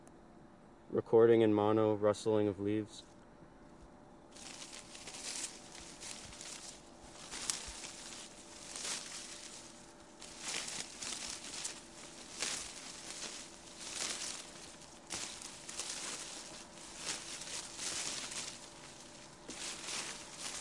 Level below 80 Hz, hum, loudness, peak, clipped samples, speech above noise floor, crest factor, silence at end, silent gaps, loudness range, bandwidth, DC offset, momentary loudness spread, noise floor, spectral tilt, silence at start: -68 dBFS; none; -38 LUFS; -12 dBFS; under 0.1%; 28 dB; 28 dB; 0 s; none; 12 LU; 11.5 kHz; under 0.1%; 21 LU; -59 dBFS; -3.5 dB/octave; 0 s